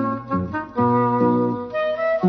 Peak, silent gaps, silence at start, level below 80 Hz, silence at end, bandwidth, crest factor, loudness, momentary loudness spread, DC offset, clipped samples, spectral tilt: -6 dBFS; none; 0 s; -54 dBFS; 0 s; 6 kHz; 14 dB; -21 LUFS; 7 LU; under 0.1%; under 0.1%; -10 dB/octave